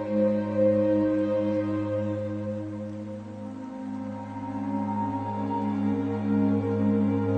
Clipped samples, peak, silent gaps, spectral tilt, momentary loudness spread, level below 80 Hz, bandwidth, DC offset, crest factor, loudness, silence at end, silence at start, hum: under 0.1%; -12 dBFS; none; -9.5 dB/octave; 12 LU; -62 dBFS; 7.6 kHz; under 0.1%; 14 dB; -27 LUFS; 0 s; 0 s; none